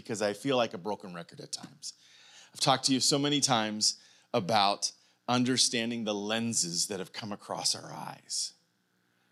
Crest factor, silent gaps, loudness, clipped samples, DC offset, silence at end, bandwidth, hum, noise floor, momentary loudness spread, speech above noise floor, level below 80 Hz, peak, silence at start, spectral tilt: 22 dB; none; -29 LUFS; under 0.1%; under 0.1%; 0.8 s; 15.5 kHz; 60 Hz at -65 dBFS; -73 dBFS; 17 LU; 43 dB; -86 dBFS; -10 dBFS; 0.05 s; -2.5 dB/octave